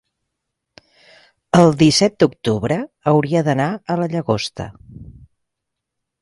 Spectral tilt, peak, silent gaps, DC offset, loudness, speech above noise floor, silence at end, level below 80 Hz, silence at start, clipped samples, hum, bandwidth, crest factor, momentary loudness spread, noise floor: -5.5 dB/octave; 0 dBFS; none; under 0.1%; -17 LUFS; 63 dB; 1.1 s; -48 dBFS; 1.55 s; under 0.1%; none; 11.5 kHz; 18 dB; 9 LU; -79 dBFS